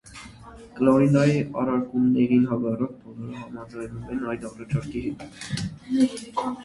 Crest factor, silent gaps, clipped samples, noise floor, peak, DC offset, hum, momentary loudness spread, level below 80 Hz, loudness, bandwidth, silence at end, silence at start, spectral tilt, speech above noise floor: 20 dB; none; under 0.1%; -45 dBFS; -4 dBFS; under 0.1%; none; 18 LU; -52 dBFS; -24 LUFS; 11.5 kHz; 0 s; 0.05 s; -7.5 dB/octave; 21 dB